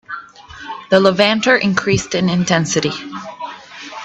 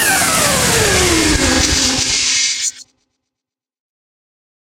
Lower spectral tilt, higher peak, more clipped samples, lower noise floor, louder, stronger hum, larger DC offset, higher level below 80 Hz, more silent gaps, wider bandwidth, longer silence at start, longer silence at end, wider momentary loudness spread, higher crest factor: first, -4.5 dB/octave vs -2 dB/octave; about the same, 0 dBFS vs 0 dBFS; neither; second, -36 dBFS vs -85 dBFS; second, -15 LUFS vs -12 LUFS; neither; neither; second, -48 dBFS vs -30 dBFS; neither; second, 8.4 kHz vs 16 kHz; about the same, 0.1 s vs 0 s; second, 0 s vs 1.85 s; first, 18 LU vs 3 LU; about the same, 18 dB vs 16 dB